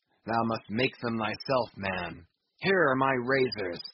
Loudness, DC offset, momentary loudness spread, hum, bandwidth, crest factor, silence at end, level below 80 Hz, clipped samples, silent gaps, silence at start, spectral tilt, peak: -29 LUFS; under 0.1%; 8 LU; none; 5.8 kHz; 18 dB; 0.05 s; -62 dBFS; under 0.1%; none; 0.25 s; -3.5 dB/octave; -12 dBFS